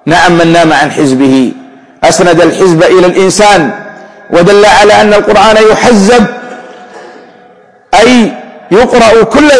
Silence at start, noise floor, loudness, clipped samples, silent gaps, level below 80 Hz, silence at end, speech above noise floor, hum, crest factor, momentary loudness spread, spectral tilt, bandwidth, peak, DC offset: 0.05 s; -38 dBFS; -5 LUFS; 5%; none; -32 dBFS; 0 s; 35 dB; none; 6 dB; 9 LU; -4.5 dB/octave; 11 kHz; 0 dBFS; under 0.1%